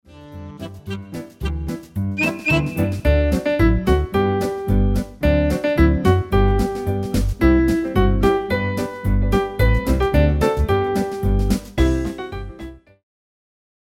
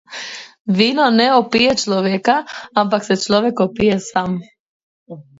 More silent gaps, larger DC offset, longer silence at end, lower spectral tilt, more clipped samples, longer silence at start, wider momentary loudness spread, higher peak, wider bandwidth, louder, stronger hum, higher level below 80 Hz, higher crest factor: second, none vs 0.60-0.65 s, 4.60-5.06 s; neither; first, 1.05 s vs 0.2 s; first, -7 dB/octave vs -4.5 dB/octave; neither; about the same, 0.15 s vs 0.1 s; about the same, 14 LU vs 13 LU; about the same, -2 dBFS vs 0 dBFS; first, 16.5 kHz vs 8 kHz; second, -19 LUFS vs -16 LUFS; neither; first, -24 dBFS vs -52 dBFS; about the same, 16 dB vs 16 dB